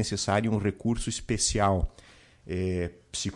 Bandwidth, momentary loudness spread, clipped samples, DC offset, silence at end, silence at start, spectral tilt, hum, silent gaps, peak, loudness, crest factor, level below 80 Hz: 11.5 kHz; 9 LU; under 0.1%; under 0.1%; 0 s; 0 s; -4.5 dB/octave; none; none; -14 dBFS; -28 LUFS; 16 dB; -40 dBFS